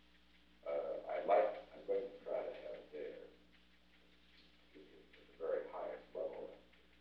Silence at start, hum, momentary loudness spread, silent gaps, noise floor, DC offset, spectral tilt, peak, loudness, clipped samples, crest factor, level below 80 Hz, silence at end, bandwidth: 0.65 s; none; 27 LU; none; -70 dBFS; under 0.1%; -6 dB/octave; -22 dBFS; -42 LUFS; under 0.1%; 22 dB; -76 dBFS; 0.4 s; 6 kHz